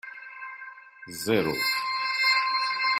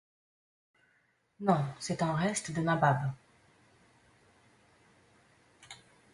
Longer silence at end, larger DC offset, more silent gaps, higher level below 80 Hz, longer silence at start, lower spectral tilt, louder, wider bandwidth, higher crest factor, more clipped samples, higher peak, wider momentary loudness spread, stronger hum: second, 0 s vs 0.4 s; neither; neither; about the same, -66 dBFS vs -68 dBFS; second, 0.05 s vs 1.4 s; second, -3 dB/octave vs -5.5 dB/octave; first, -25 LUFS vs -31 LUFS; first, 16 kHz vs 11.5 kHz; about the same, 18 dB vs 22 dB; neither; about the same, -10 dBFS vs -12 dBFS; second, 19 LU vs 24 LU; neither